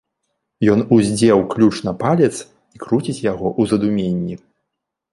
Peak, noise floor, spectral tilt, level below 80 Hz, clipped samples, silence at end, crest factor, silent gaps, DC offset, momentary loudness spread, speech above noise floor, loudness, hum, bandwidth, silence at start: -2 dBFS; -79 dBFS; -6.5 dB/octave; -50 dBFS; under 0.1%; 0.75 s; 16 dB; none; under 0.1%; 10 LU; 63 dB; -17 LUFS; none; 11.5 kHz; 0.6 s